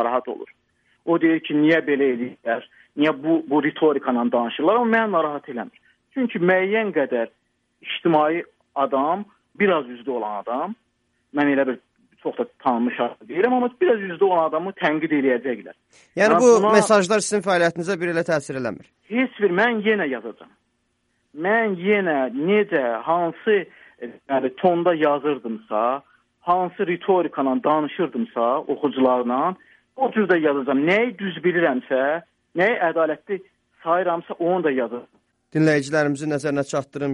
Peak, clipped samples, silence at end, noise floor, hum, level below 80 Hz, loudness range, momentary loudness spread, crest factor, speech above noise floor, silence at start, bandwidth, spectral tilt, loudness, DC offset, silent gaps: 0 dBFS; under 0.1%; 0 s; -70 dBFS; none; -70 dBFS; 5 LU; 12 LU; 20 dB; 49 dB; 0 s; 11.5 kHz; -5.5 dB/octave; -21 LUFS; under 0.1%; none